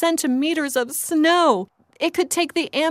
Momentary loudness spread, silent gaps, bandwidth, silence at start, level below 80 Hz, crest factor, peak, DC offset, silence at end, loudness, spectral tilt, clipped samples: 8 LU; none; 16 kHz; 0 s; -70 dBFS; 16 dB; -6 dBFS; under 0.1%; 0 s; -20 LUFS; -2 dB/octave; under 0.1%